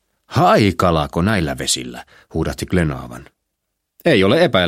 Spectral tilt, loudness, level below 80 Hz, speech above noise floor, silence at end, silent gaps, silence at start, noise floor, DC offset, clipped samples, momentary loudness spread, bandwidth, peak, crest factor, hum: -5 dB/octave; -17 LUFS; -38 dBFS; 59 dB; 0 s; none; 0.3 s; -75 dBFS; under 0.1%; under 0.1%; 16 LU; 16 kHz; 0 dBFS; 18 dB; none